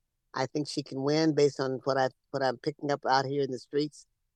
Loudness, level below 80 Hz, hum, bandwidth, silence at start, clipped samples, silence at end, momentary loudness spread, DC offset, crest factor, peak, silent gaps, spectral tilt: -30 LUFS; -76 dBFS; none; 10 kHz; 0.35 s; under 0.1%; 0.35 s; 8 LU; under 0.1%; 20 dB; -10 dBFS; none; -5.5 dB/octave